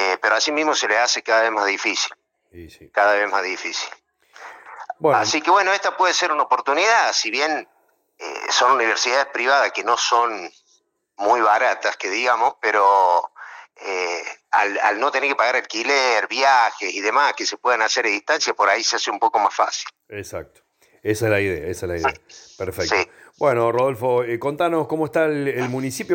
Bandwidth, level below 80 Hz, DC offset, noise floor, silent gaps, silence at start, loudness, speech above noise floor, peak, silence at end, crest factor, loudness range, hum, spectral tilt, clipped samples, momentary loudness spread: 17 kHz; -58 dBFS; under 0.1%; -63 dBFS; none; 0 s; -19 LUFS; 43 dB; -4 dBFS; 0 s; 16 dB; 4 LU; none; -2.5 dB/octave; under 0.1%; 13 LU